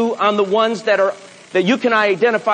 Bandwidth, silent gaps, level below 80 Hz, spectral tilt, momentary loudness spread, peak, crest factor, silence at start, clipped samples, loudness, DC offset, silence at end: 9.8 kHz; none; -74 dBFS; -5 dB/octave; 5 LU; -2 dBFS; 14 dB; 0 s; under 0.1%; -16 LUFS; under 0.1%; 0 s